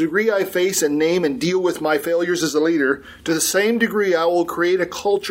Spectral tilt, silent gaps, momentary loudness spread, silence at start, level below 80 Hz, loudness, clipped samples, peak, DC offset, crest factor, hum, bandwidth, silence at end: -3.5 dB/octave; none; 3 LU; 0 s; -58 dBFS; -19 LUFS; under 0.1%; -4 dBFS; under 0.1%; 14 dB; none; 16.5 kHz; 0 s